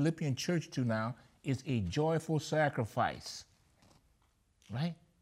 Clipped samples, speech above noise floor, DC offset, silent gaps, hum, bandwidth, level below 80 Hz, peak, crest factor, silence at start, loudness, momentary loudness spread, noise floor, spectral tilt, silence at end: under 0.1%; 38 dB; under 0.1%; none; none; 15 kHz; -64 dBFS; -20 dBFS; 16 dB; 0 s; -35 LUFS; 11 LU; -72 dBFS; -6 dB/octave; 0.3 s